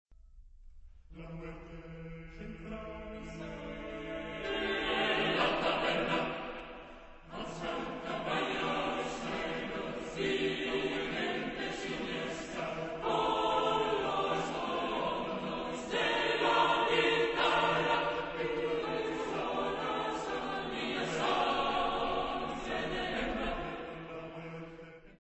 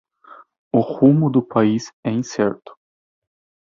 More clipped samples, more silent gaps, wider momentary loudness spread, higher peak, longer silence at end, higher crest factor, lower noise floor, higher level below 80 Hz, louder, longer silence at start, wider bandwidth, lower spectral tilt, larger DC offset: neither; second, none vs 1.93-2.03 s; first, 16 LU vs 9 LU; second, -16 dBFS vs -2 dBFS; second, 0.05 s vs 1.05 s; about the same, 18 dB vs 18 dB; first, -55 dBFS vs -46 dBFS; first, -54 dBFS vs -60 dBFS; second, -34 LUFS vs -19 LUFS; second, 0.1 s vs 0.75 s; first, 8.2 kHz vs 7.4 kHz; second, -4.5 dB/octave vs -7.5 dB/octave; neither